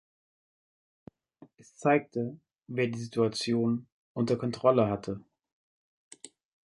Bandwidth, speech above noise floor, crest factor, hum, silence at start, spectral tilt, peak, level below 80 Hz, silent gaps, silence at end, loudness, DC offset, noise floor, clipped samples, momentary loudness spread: 11.5 kHz; 30 dB; 22 dB; none; 1.8 s; -6 dB/octave; -10 dBFS; -66 dBFS; 3.92-4.15 s, 5.52-6.11 s; 0.4 s; -30 LUFS; under 0.1%; -59 dBFS; under 0.1%; 18 LU